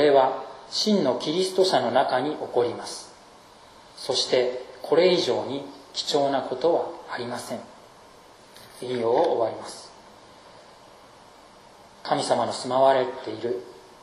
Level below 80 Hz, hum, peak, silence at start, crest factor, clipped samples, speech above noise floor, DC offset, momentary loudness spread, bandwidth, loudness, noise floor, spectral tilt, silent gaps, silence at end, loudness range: -68 dBFS; none; -6 dBFS; 0 s; 20 dB; under 0.1%; 26 dB; under 0.1%; 16 LU; 13.5 kHz; -24 LUFS; -50 dBFS; -4 dB/octave; none; 0.25 s; 5 LU